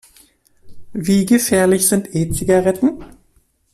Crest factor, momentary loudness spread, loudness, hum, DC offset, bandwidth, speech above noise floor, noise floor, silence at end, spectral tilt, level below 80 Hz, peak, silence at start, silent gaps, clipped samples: 14 dB; 10 LU; -16 LUFS; none; under 0.1%; 14.5 kHz; 43 dB; -58 dBFS; 0.65 s; -5 dB/octave; -42 dBFS; -2 dBFS; 0.65 s; none; under 0.1%